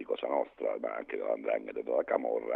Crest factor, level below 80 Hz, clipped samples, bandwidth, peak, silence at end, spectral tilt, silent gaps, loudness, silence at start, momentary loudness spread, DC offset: 20 dB; -74 dBFS; under 0.1%; 4 kHz; -12 dBFS; 0 s; -6.5 dB/octave; none; -34 LUFS; 0 s; 6 LU; under 0.1%